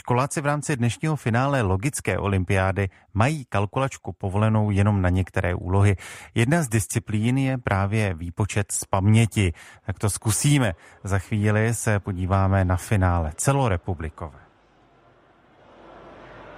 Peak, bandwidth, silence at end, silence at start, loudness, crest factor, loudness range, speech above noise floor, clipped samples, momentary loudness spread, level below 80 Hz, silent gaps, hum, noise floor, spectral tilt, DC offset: -6 dBFS; 15.5 kHz; 0 s; 0.05 s; -23 LUFS; 18 dB; 2 LU; 35 dB; under 0.1%; 8 LU; -44 dBFS; none; none; -57 dBFS; -6 dB/octave; under 0.1%